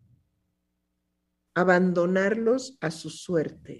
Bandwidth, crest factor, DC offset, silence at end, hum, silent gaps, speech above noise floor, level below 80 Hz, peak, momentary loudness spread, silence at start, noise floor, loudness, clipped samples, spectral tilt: 12 kHz; 20 dB; under 0.1%; 0 s; none; none; 53 dB; -68 dBFS; -6 dBFS; 12 LU; 1.55 s; -78 dBFS; -25 LUFS; under 0.1%; -6 dB/octave